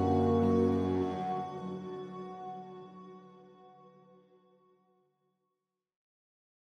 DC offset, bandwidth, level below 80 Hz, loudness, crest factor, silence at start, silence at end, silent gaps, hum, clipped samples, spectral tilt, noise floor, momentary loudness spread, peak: under 0.1%; 9.2 kHz; -66 dBFS; -33 LUFS; 18 dB; 0 s; 2.95 s; none; none; under 0.1%; -9 dB/octave; -87 dBFS; 23 LU; -18 dBFS